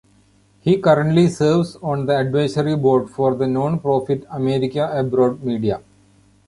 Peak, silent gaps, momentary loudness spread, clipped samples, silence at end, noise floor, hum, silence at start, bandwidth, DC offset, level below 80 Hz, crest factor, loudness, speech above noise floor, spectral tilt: -2 dBFS; none; 8 LU; under 0.1%; 0.7 s; -55 dBFS; none; 0.65 s; 11.5 kHz; under 0.1%; -52 dBFS; 16 dB; -19 LUFS; 37 dB; -7.5 dB/octave